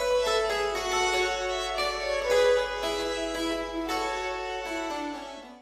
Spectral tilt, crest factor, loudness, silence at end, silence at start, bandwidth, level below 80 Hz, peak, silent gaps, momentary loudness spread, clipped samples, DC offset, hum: -2 dB/octave; 16 dB; -28 LUFS; 0 s; 0 s; 15.5 kHz; -48 dBFS; -12 dBFS; none; 9 LU; under 0.1%; under 0.1%; none